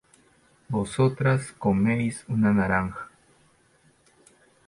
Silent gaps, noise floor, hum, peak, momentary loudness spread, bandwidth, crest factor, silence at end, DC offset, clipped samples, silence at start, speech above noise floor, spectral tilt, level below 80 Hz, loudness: none; -62 dBFS; none; -10 dBFS; 10 LU; 11.5 kHz; 18 dB; 1.6 s; under 0.1%; under 0.1%; 0.7 s; 38 dB; -7 dB/octave; -52 dBFS; -25 LUFS